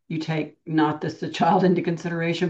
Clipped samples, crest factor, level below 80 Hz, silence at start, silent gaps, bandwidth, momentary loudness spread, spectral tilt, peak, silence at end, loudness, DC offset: under 0.1%; 16 dB; -68 dBFS; 0.1 s; none; 8 kHz; 10 LU; -7 dB/octave; -8 dBFS; 0 s; -23 LUFS; under 0.1%